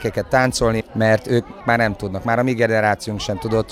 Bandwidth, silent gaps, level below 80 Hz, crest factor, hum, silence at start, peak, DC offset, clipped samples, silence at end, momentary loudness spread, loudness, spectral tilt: 15 kHz; none; -40 dBFS; 16 dB; none; 0 s; -2 dBFS; under 0.1%; under 0.1%; 0 s; 6 LU; -19 LUFS; -5.5 dB/octave